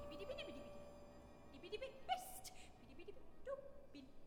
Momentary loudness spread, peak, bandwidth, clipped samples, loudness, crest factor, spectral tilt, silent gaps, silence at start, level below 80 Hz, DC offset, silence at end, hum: 15 LU; -30 dBFS; 19.5 kHz; under 0.1%; -53 LUFS; 22 dB; -3.5 dB/octave; none; 0 s; -66 dBFS; under 0.1%; 0 s; none